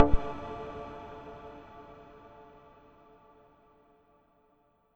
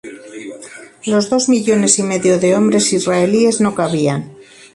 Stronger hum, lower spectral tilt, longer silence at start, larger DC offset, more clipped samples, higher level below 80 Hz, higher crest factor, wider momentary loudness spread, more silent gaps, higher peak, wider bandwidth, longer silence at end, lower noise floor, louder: neither; first, -8.5 dB/octave vs -4.5 dB/octave; about the same, 0 s vs 0.05 s; neither; neither; first, -40 dBFS vs -56 dBFS; first, 28 dB vs 16 dB; about the same, 21 LU vs 19 LU; neither; second, -4 dBFS vs 0 dBFS; second, 4.5 kHz vs 11.5 kHz; first, 3.15 s vs 0.35 s; first, -68 dBFS vs -36 dBFS; second, -38 LUFS vs -14 LUFS